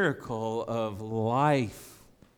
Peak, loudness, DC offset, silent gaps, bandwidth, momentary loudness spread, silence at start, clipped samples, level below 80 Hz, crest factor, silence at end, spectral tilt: -12 dBFS; -29 LUFS; under 0.1%; none; 20 kHz; 10 LU; 0 s; under 0.1%; -62 dBFS; 18 dB; 0.4 s; -6.5 dB/octave